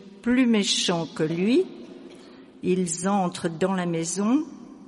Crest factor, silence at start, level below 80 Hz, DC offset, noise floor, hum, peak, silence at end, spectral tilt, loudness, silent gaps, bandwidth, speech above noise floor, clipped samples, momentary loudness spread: 14 dB; 0 s; -64 dBFS; under 0.1%; -47 dBFS; none; -10 dBFS; 0.05 s; -4.5 dB/octave; -24 LUFS; none; 11.5 kHz; 23 dB; under 0.1%; 12 LU